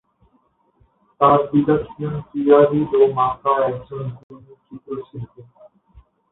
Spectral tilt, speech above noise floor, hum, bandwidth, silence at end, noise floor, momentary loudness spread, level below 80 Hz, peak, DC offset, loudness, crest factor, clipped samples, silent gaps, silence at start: -12 dB/octave; 44 dB; none; 4 kHz; 0.9 s; -62 dBFS; 18 LU; -52 dBFS; -2 dBFS; under 0.1%; -18 LUFS; 18 dB; under 0.1%; 4.23-4.29 s; 1.2 s